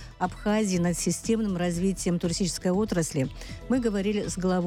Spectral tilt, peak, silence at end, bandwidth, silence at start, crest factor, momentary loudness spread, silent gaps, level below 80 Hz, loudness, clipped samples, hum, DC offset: -5.5 dB/octave; -14 dBFS; 0 s; 16 kHz; 0 s; 12 dB; 4 LU; none; -44 dBFS; -27 LUFS; under 0.1%; none; under 0.1%